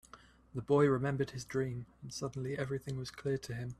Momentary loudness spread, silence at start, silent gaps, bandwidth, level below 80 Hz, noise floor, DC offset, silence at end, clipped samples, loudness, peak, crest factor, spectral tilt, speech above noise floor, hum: 16 LU; 0.15 s; none; 13.5 kHz; -62 dBFS; -59 dBFS; under 0.1%; 0.05 s; under 0.1%; -36 LUFS; -16 dBFS; 18 dB; -6.5 dB/octave; 24 dB; none